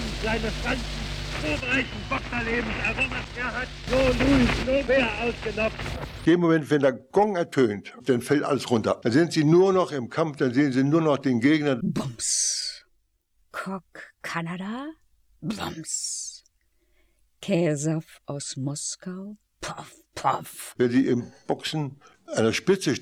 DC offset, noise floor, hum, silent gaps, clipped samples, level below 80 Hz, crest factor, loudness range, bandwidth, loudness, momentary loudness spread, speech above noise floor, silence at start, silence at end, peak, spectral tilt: under 0.1%; -68 dBFS; none; none; under 0.1%; -42 dBFS; 18 dB; 10 LU; 16 kHz; -25 LUFS; 14 LU; 44 dB; 0 s; 0 s; -8 dBFS; -4.5 dB/octave